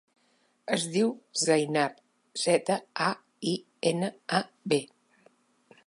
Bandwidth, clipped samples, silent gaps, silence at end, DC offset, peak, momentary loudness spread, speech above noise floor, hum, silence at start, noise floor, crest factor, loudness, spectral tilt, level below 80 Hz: 11.5 kHz; under 0.1%; none; 1 s; under 0.1%; -10 dBFS; 7 LU; 41 dB; none; 0.65 s; -69 dBFS; 20 dB; -29 LUFS; -4 dB/octave; -82 dBFS